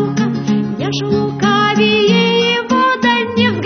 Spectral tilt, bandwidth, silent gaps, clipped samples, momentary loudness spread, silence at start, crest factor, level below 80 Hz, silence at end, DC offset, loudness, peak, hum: -5.5 dB/octave; 6.6 kHz; none; under 0.1%; 6 LU; 0 s; 14 dB; -52 dBFS; 0 s; under 0.1%; -13 LUFS; 0 dBFS; none